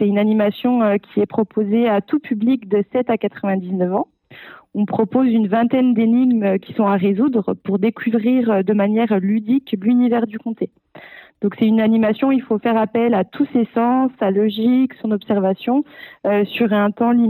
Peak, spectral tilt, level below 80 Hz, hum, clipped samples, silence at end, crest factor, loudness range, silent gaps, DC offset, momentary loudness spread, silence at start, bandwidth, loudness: -6 dBFS; -11.5 dB/octave; -70 dBFS; none; under 0.1%; 0 s; 12 dB; 2 LU; none; under 0.1%; 6 LU; 0 s; 4.2 kHz; -18 LUFS